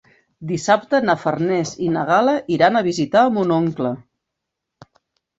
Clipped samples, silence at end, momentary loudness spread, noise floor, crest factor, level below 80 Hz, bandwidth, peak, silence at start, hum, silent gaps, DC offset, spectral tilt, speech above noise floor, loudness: under 0.1%; 1.4 s; 9 LU; -80 dBFS; 18 dB; -60 dBFS; 8 kHz; -2 dBFS; 0.4 s; none; none; under 0.1%; -5.5 dB/octave; 63 dB; -18 LUFS